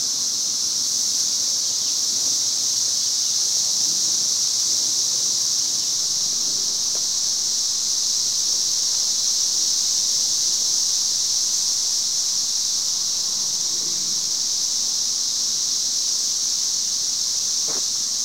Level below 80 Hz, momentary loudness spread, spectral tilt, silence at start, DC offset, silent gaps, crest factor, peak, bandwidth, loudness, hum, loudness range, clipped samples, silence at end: -68 dBFS; 2 LU; 2.5 dB/octave; 0 s; under 0.1%; none; 14 dB; -8 dBFS; 16 kHz; -18 LUFS; none; 2 LU; under 0.1%; 0 s